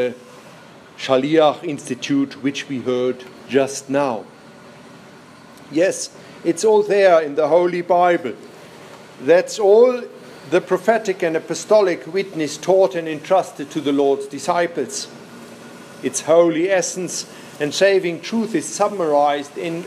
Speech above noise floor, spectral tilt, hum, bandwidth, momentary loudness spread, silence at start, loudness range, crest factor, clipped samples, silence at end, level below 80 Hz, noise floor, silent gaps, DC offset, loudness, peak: 25 dB; -4 dB/octave; none; 14.5 kHz; 14 LU; 0 s; 5 LU; 16 dB; under 0.1%; 0 s; -72 dBFS; -43 dBFS; none; under 0.1%; -18 LUFS; -2 dBFS